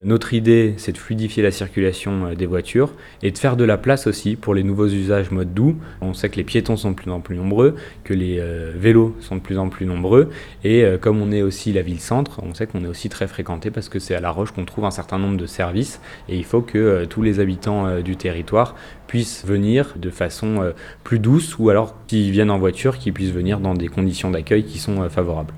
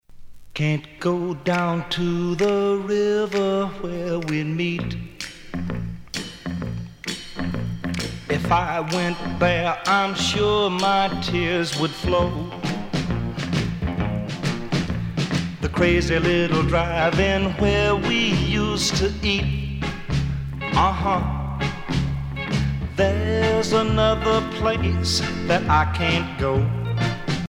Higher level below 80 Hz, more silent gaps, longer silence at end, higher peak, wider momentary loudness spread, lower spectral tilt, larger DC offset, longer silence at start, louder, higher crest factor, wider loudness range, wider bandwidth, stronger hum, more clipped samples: second, -40 dBFS vs -34 dBFS; neither; about the same, 0 s vs 0 s; first, 0 dBFS vs -4 dBFS; about the same, 11 LU vs 9 LU; first, -7 dB/octave vs -5.5 dB/octave; neither; about the same, 0 s vs 0.1 s; about the same, -20 LUFS vs -22 LUFS; about the same, 18 dB vs 18 dB; about the same, 5 LU vs 6 LU; about the same, 15 kHz vs 16 kHz; neither; neither